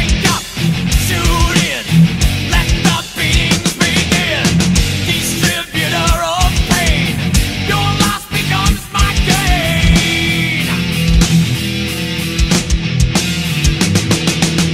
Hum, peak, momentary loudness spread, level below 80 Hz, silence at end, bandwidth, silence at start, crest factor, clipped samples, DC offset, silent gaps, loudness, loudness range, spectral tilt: none; 0 dBFS; 4 LU; -20 dBFS; 0 s; 16.5 kHz; 0 s; 14 dB; under 0.1%; under 0.1%; none; -13 LUFS; 1 LU; -4 dB/octave